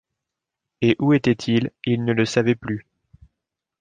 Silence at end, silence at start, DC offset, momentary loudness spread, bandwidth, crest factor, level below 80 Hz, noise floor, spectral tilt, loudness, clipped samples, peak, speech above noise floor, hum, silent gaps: 1 s; 0.8 s; under 0.1%; 7 LU; 9.4 kHz; 18 dB; -56 dBFS; -84 dBFS; -6.5 dB/octave; -21 LUFS; under 0.1%; -4 dBFS; 64 dB; none; none